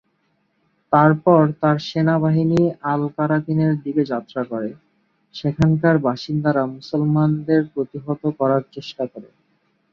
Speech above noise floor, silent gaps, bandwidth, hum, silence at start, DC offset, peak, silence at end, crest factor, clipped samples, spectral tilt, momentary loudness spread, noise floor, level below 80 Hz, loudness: 48 dB; none; 6.8 kHz; none; 0.9 s; under 0.1%; -2 dBFS; 0.7 s; 18 dB; under 0.1%; -8.5 dB/octave; 12 LU; -67 dBFS; -52 dBFS; -19 LUFS